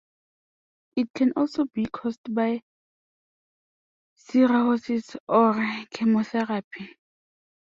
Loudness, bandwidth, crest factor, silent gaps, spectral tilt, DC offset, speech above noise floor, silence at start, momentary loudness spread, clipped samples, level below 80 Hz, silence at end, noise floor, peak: -25 LUFS; 7.4 kHz; 20 dB; 1.10-1.14 s, 2.18-2.24 s, 2.62-4.16 s, 5.20-5.27 s, 6.64-6.71 s; -6.5 dB/octave; under 0.1%; over 66 dB; 0.95 s; 12 LU; under 0.1%; -68 dBFS; 0.75 s; under -90 dBFS; -6 dBFS